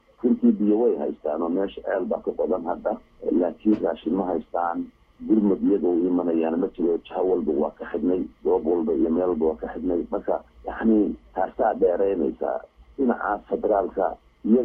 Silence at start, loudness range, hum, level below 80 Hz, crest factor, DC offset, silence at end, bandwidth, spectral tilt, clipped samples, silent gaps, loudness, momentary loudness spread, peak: 0.25 s; 2 LU; none; -52 dBFS; 16 dB; under 0.1%; 0 s; 3.7 kHz; -10.5 dB/octave; under 0.1%; none; -24 LUFS; 8 LU; -8 dBFS